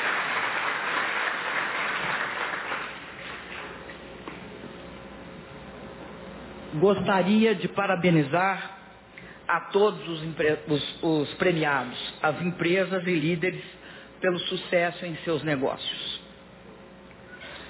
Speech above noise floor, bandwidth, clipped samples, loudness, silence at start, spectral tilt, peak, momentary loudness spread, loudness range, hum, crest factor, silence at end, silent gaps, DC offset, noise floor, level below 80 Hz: 22 dB; 4 kHz; under 0.1%; -26 LUFS; 0 s; -9.5 dB/octave; -10 dBFS; 20 LU; 11 LU; none; 18 dB; 0 s; none; under 0.1%; -48 dBFS; -58 dBFS